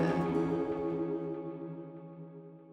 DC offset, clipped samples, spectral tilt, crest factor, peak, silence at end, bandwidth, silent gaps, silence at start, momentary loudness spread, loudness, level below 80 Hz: under 0.1%; under 0.1%; -8.5 dB/octave; 16 dB; -18 dBFS; 0 s; 9 kHz; none; 0 s; 17 LU; -35 LUFS; -64 dBFS